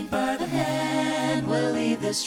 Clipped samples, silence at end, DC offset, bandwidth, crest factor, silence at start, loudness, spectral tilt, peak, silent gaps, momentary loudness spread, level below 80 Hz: under 0.1%; 0 s; under 0.1%; 17.5 kHz; 14 dB; 0 s; -25 LUFS; -4.5 dB/octave; -12 dBFS; none; 2 LU; -56 dBFS